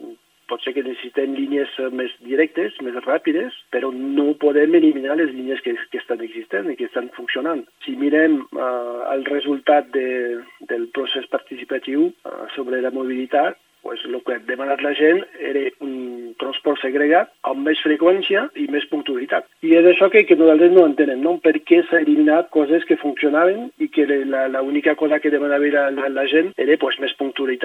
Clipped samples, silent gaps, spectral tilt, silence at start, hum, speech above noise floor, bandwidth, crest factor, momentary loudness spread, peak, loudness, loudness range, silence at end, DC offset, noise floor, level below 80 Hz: under 0.1%; none; -6 dB/octave; 0 s; none; 21 dB; 4.1 kHz; 18 dB; 13 LU; 0 dBFS; -19 LUFS; 9 LU; 0 s; under 0.1%; -39 dBFS; -82 dBFS